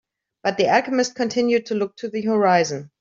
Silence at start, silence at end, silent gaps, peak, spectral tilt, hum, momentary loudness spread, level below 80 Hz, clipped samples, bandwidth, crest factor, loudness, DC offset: 0.45 s; 0.15 s; none; -4 dBFS; -4.5 dB/octave; none; 9 LU; -66 dBFS; under 0.1%; 7.6 kHz; 16 dB; -21 LUFS; under 0.1%